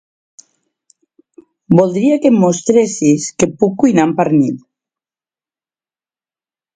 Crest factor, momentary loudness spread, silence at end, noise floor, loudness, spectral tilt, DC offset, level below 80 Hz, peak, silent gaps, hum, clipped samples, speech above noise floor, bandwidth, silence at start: 16 dB; 3 LU; 2.15 s; under -90 dBFS; -13 LUFS; -6 dB/octave; under 0.1%; -54 dBFS; 0 dBFS; none; none; under 0.1%; over 78 dB; 9.4 kHz; 1.7 s